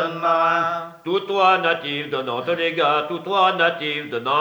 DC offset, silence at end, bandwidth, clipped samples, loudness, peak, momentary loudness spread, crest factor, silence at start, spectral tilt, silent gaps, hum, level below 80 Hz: under 0.1%; 0 s; over 20 kHz; under 0.1%; -20 LUFS; -4 dBFS; 8 LU; 18 dB; 0 s; -5 dB/octave; none; none; -74 dBFS